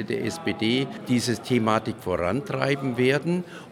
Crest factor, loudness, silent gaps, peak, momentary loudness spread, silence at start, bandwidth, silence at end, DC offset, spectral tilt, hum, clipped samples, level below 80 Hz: 20 dB; -25 LUFS; none; -4 dBFS; 6 LU; 0 s; 16.5 kHz; 0 s; under 0.1%; -5.5 dB/octave; none; under 0.1%; -58 dBFS